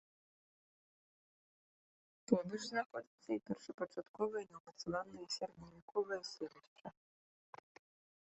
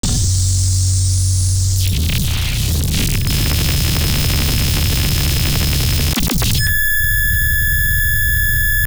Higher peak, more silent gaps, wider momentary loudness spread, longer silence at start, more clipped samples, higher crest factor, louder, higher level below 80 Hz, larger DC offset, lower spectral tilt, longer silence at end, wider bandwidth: second, -16 dBFS vs -4 dBFS; first, 2.86-2.90 s, 3.07-3.18 s, 3.74-3.78 s, 4.09-4.14 s, 4.60-4.65 s, 5.82-5.88 s, 6.67-6.76 s vs none; first, 21 LU vs 3 LU; first, 2.3 s vs 0.05 s; neither; first, 28 dB vs 10 dB; second, -43 LUFS vs -15 LUFS; second, -80 dBFS vs -20 dBFS; neither; first, -4.5 dB/octave vs -3 dB/octave; first, 1.35 s vs 0 s; second, 8.2 kHz vs over 20 kHz